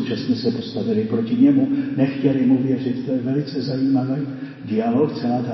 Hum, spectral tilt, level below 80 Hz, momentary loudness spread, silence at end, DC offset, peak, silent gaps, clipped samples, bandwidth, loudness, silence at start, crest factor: none; -9 dB/octave; -62 dBFS; 8 LU; 0 s; under 0.1%; -4 dBFS; none; under 0.1%; 6 kHz; -20 LUFS; 0 s; 16 dB